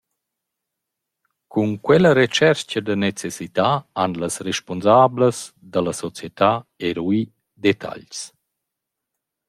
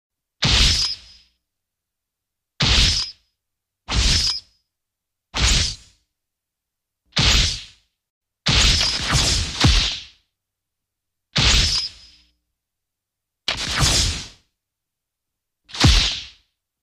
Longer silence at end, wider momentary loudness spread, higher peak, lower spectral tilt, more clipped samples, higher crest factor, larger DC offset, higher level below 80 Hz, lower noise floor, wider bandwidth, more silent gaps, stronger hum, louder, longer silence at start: first, 1.2 s vs 0.55 s; first, 17 LU vs 14 LU; about the same, -2 dBFS vs -2 dBFS; first, -5 dB/octave vs -2.5 dB/octave; neither; about the same, 20 dB vs 20 dB; neither; second, -60 dBFS vs -28 dBFS; about the same, -82 dBFS vs -83 dBFS; about the same, 14.5 kHz vs 15.5 kHz; second, none vs 8.10-8.21 s; neither; about the same, -20 LUFS vs -18 LUFS; first, 1.55 s vs 0.4 s